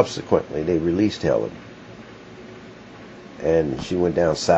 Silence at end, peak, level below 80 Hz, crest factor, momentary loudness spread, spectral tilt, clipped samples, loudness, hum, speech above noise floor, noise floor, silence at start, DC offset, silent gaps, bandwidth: 0 s; -2 dBFS; -48 dBFS; 22 dB; 21 LU; -6 dB/octave; under 0.1%; -22 LUFS; none; 21 dB; -41 dBFS; 0 s; under 0.1%; none; 8.2 kHz